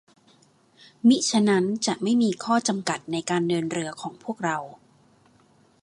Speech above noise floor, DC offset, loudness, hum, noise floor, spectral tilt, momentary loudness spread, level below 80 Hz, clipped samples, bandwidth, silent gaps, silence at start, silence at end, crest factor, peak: 36 dB; under 0.1%; -24 LUFS; none; -59 dBFS; -4.5 dB/octave; 12 LU; -72 dBFS; under 0.1%; 11 kHz; none; 1.05 s; 1.05 s; 18 dB; -6 dBFS